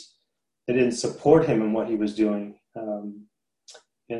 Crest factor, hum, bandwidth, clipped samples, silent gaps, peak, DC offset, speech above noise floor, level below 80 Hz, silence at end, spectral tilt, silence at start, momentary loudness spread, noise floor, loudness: 20 dB; none; 11 kHz; under 0.1%; none; -4 dBFS; under 0.1%; 56 dB; -58 dBFS; 0 s; -6 dB/octave; 0 s; 18 LU; -79 dBFS; -24 LUFS